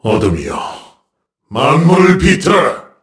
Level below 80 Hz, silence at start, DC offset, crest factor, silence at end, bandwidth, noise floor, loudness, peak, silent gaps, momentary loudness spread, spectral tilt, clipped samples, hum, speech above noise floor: -32 dBFS; 0.05 s; under 0.1%; 12 dB; 0.2 s; 11 kHz; -67 dBFS; -11 LUFS; 0 dBFS; none; 14 LU; -6 dB/octave; 0.2%; none; 56 dB